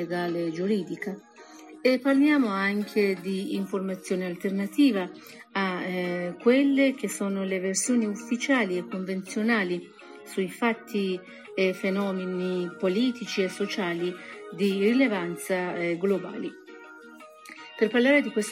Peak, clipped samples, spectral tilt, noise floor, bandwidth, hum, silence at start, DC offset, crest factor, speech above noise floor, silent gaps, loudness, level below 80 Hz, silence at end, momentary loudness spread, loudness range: -10 dBFS; under 0.1%; -5 dB/octave; -48 dBFS; 16 kHz; none; 0 s; under 0.1%; 18 dB; 21 dB; none; -27 LUFS; -78 dBFS; 0 s; 15 LU; 3 LU